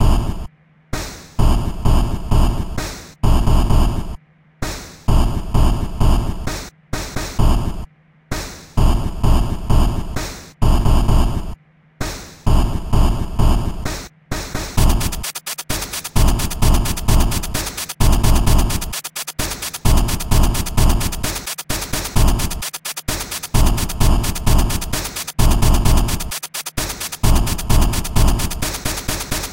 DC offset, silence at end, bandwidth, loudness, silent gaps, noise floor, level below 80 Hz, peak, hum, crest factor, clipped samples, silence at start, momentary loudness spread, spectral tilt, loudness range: 1%; 0 s; 16.5 kHz; -20 LUFS; none; -37 dBFS; -18 dBFS; 0 dBFS; none; 16 dB; under 0.1%; 0 s; 11 LU; -4.5 dB/octave; 3 LU